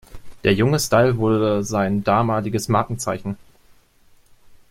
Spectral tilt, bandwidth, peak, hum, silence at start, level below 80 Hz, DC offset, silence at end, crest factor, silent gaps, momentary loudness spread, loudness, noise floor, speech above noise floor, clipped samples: -5.5 dB/octave; 16.5 kHz; -2 dBFS; none; 0.1 s; -46 dBFS; under 0.1%; 0.15 s; 18 dB; none; 9 LU; -20 LUFS; -53 dBFS; 35 dB; under 0.1%